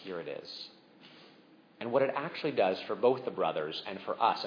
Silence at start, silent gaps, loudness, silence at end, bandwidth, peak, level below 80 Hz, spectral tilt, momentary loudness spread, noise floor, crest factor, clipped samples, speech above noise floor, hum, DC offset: 0 s; none; -32 LUFS; 0 s; 5.4 kHz; -12 dBFS; -86 dBFS; -6.5 dB/octave; 13 LU; -60 dBFS; 20 dB; under 0.1%; 28 dB; none; under 0.1%